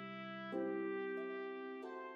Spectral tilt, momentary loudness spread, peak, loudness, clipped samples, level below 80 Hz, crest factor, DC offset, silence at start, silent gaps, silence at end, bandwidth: -7.5 dB/octave; 7 LU; -32 dBFS; -44 LUFS; under 0.1%; under -90 dBFS; 12 dB; under 0.1%; 0 s; none; 0 s; 5.8 kHz